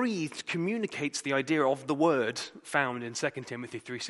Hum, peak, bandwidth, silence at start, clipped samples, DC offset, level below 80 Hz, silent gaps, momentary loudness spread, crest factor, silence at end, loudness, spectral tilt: none; -10 dBFS; 11.5 kHz; 0 s; under 0.1%; under 0.1%; -78 dBFS; none; 12 LU; 20 dB; 0 s; -31 LUFS; -4.5 dB/octave